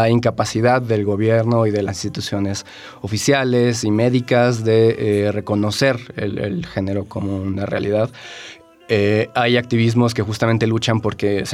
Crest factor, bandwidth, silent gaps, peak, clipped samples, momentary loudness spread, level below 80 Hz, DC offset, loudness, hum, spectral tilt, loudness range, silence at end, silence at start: 14 dB; 14 kHz; none; -2 dBFS; under 0.1%; 9 LU; -54 dBFS; under 0.1%; -18 LUFS; none; -6 dB/octave; 4 LU; 0 s; 0 s